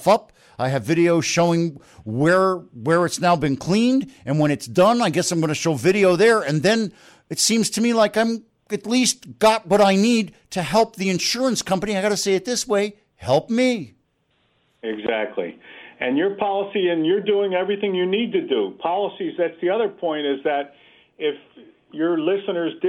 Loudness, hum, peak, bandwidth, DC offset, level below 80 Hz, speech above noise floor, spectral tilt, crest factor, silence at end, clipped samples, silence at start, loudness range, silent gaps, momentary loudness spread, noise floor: -20 LUFS; none; -6 dBFS; 16 kHz; under 0.1%; -58 dBFS; 46 dB; -4.5 dB/octave; 14 dB; 0 s; under 0.1%; 0 s; 6 LU; none; 11 LU; -66 dBFS